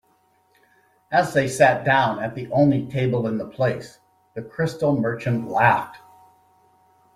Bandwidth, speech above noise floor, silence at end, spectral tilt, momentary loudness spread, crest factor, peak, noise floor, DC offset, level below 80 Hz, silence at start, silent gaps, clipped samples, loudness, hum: 14.5 kHz; 42 dB; 1.2 s; -6.5 dB/octave; 12 LU; 20 dB; -4 dBFS; -62 dBFS; under 0.1%; -58 dBFS; 1.1 s; none; under 0.1%; -21 LUFS; none